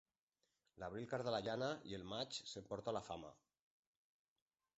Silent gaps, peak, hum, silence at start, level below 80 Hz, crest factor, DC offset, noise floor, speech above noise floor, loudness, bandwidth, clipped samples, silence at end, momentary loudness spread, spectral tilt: none; -28 dBFS; none; 0.75 s; -76 dBFS; 22 dB; under 0.1%; -89 dBFS; 43 dB; -46 LUFS; 8 kHz; under 0.1%; 1.45 s; 10 LU; -3.5 dB/octave